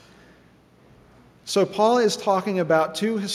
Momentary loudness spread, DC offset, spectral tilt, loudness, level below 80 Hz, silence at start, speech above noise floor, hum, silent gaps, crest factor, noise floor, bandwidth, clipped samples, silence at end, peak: 7 LU; under 0.1%; -4.5 dB/octave; -21 LUFS; -66 dBFS; 1.45 s; 33 dB; none; none; 18 dB; -54 dBFS; 15 kHz; under 0.1%; 0 s; -6 dBFS